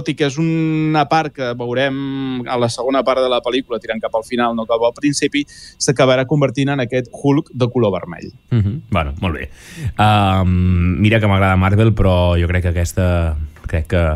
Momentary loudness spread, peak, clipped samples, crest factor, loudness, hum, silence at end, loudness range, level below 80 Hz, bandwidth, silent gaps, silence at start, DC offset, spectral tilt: 9 LU; -2 dBFS; under 0.1%; 14 dB; -17 LUFS; none; 0 s; 4 LU; -32 dBFS; 12.5 kHz; none; 0 s; under 0.1%; -6 dB/octave